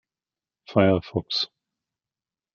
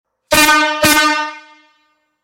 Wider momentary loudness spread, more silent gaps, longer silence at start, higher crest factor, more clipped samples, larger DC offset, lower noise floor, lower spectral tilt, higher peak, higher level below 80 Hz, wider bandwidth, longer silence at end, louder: about the same, 7 LU vs 9 LU; neither; first, 0.7 s vs 0.3 s; first, 24 dB vs 14 dB; neither; neither; first, under -90 dBFS vs -61 dBFS; first, -6.5 dB/octave vs -1.5 dB/octave; second, -4 dBFS vs 0 dBFS; second, -60 dBFS vs -44 dBFS; second, 7 kHz vs 17 kHz; first, 1.1 s vs 0.85 s; second, -24 LUFS vs -11 LUFS